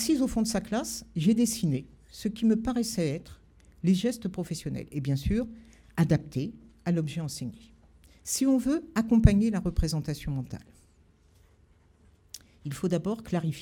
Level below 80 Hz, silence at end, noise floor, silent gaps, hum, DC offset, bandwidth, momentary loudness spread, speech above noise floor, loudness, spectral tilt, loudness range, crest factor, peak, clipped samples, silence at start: -40 dBFS; 0 s; -61 dBFS; none; none; under 0.1%; 18 kHz; 14 LU; 34 dB; -29 LUFS; -6 dB/octave; 8 LU; 26 dB; -4 dBFS; under 0.1%; 0 s